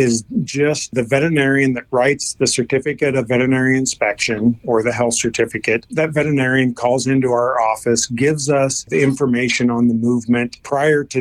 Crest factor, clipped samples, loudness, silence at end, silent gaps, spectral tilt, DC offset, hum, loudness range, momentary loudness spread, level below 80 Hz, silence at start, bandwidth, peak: 14 dB; under 0.1%; -17 LUFS; 0 s; none; -4.5 dB/octave; under 0.1%; none; 1 LU; 4 LU; -52 dBFS; 0 s; 14 kHz; -2 dBFS